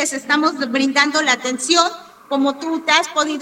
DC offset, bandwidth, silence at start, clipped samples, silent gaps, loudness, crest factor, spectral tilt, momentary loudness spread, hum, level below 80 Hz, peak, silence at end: under 0.1%; 16 kHz; 0 s; under 0.1%; none; -17 LUFS; 18 dB; -0.5 dB/octave; 6 LU; none; -68 dBFS; 0 dBFS; 0 s